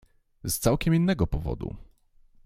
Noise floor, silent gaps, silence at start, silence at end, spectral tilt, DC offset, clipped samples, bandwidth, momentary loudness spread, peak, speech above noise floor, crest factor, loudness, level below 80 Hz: -58 dBFS; none; 0.45 s; 0.6 s; -6 dB/octave; under 0.1%; under 0.1%; 16.5 kHz; 15 LU; -8 dBFS; 33 dB; 20 dB; -26 LUFS; -40 dBFS